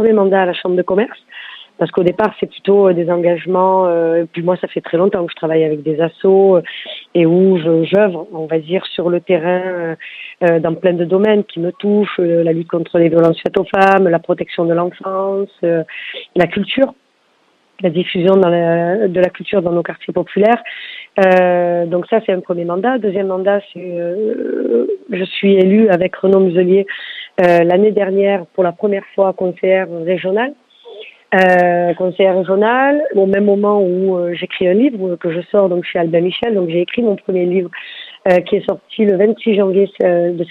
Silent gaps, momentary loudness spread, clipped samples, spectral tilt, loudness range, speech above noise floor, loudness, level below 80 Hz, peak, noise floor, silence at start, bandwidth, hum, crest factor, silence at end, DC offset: none; 9 LU; under 0.1%; -8.5 dB/octave; 3 LU; 43 dB; -14 LUFS; -58 dBFS; 0 dBFS; -57 dBFS; 0 s; 5.6 kHz; none; 14 dB; 0.05 s; under 0.1%